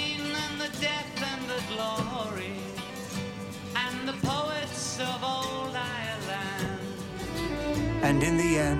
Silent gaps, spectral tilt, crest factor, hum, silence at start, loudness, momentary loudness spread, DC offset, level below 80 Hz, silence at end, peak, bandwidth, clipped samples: none; -4.5 dB/octave; 18 dB; none; 0 s; -31 LUFS; 11 LU; under 0.1%; -48 dBFS; 0 s; -12 dBFS; 16 kHz; under 0.1%